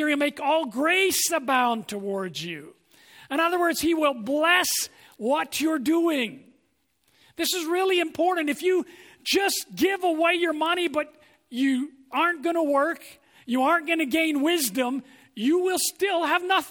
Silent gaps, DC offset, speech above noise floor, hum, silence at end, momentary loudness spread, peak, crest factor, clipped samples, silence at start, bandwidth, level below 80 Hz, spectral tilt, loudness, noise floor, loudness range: none; under 0.1%; 46 dB; none; 0 s; 9 LU; -8 dBFS; 18 dB; under 0.1%; 0 s; over 20 kHz; -68 dBFS; -2 dB/octave; -24 LUFS; -70 dBFS; 2 LU